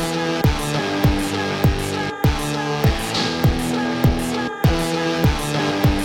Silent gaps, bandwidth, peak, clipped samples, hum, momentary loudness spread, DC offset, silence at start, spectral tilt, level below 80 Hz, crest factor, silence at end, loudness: none; 17 kHz; -4 dBFS; under 0.1%; none; 3 LU; under 0.1%; 0 s; -5.5 dB/octave; -28 dBFS; 14 dB; 0 s; -20 LUFS